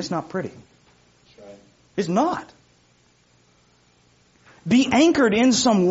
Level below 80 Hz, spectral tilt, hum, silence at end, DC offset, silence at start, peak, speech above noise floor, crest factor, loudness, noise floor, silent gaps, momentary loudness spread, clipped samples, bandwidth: -58 dBFS; -4 dB/octave; 60 Hz at -55 dBFS; 0 s; under 0.1%; 0 s; -6 dBFS; 40 dB; 16 dB; -20 LUFS; -60 dBFS; none; 16 LU; under 0.1%; 8 kHz